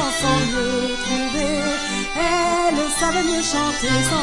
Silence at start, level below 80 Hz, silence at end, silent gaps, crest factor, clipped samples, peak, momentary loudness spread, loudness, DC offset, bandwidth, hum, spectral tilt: 0 s; -36 dBFS; 0 s; none; 14 dB; under 0.1%; -6 dBFS; 4 LU; -20 LUFS; under 0.1%; 11.5 kHz; none; -3 dB/octave